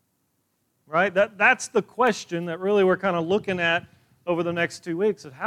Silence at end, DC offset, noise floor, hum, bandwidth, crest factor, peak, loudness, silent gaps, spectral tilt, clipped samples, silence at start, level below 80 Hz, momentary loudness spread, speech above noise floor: 0 s; under 0.1%; -72 dBFS; none; 13 kHz; 18 dB; -6 dBFS; -23 LUFS; none; -4.5 dB/octave; under 0.1%; 0.9 s; -68 dBFS; 8 LU; 49 dB